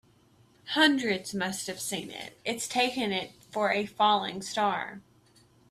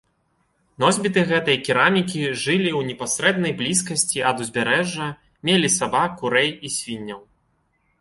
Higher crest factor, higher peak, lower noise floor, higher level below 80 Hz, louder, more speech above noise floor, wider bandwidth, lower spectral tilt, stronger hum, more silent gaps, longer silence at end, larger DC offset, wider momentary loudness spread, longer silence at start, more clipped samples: about the same, 20 dB vs 20 dB; second, -10 dBFS vs -2 dBFS; second, -62 dBFS vs -67 dBFS; second, -70 dBFS vs -58 dBFS; second, -28 LUFS vs -20 LUFS; second, 33 dB vs 46 dB; first, 15.5 kHz vs 11.5 kHz; about the same, -3 dB/octave vs -3 dB/octave; neither; neither; about the same, 0.7 s vs 0.8 s; neither; first, 13 LU vs 10 LU; second, 0.65 s vs 0.8 s; neither